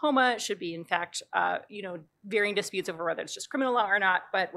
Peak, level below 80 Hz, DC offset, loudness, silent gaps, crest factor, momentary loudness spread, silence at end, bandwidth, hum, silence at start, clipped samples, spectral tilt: -10 dBFS; -86 dBFS; under 0.1%; -28 LUFS; none; 20 dB; 11 LU; 0 s; 15 kHz; none; 0 s; under 0.1%; -3 dB/octave